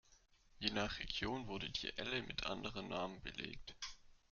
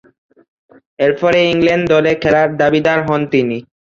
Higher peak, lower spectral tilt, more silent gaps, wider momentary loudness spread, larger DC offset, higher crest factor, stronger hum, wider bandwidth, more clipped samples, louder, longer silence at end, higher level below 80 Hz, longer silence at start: second, -20 dBFS vs -2 dBFS; second, -2 dB/octave vs -6.5 dB/octave; neither; first, 9 LU vs 4 LU; neither; first, 26 dB vs 14 dB; neither; about the same, 7.4 kHz vs 7.6 kHz; neither; second, -44 LUFS vs -13 LUFS; about the same, 0.15 s vs 0.25 s; second, -60 dBFS vs -48 dBFS; second, 0.1 s vs 1 s